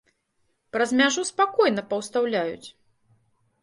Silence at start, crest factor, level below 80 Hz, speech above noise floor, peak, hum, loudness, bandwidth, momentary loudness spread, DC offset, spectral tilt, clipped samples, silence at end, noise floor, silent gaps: 0.75 s; 20 dB; -70 dBFS; 48 dB; -6 dBFS; none; -23 LUFS; 11.5 kHz; 11 LU; under 0.1%; -3 dB/octave; under 0.1%; 0.95 s; -72 dBFS; none